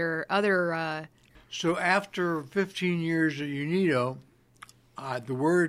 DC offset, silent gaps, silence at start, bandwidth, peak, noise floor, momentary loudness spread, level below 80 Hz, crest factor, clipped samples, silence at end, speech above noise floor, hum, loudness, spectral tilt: under 0.1%; none; 0 s; 14 kHz; -8 dBFS; -54 dBFS; 13 LU; -68 dBFS; 20 dB; under 0.1%; 0 s; 26 dB; none; -28 LUFS; -6 dB/octave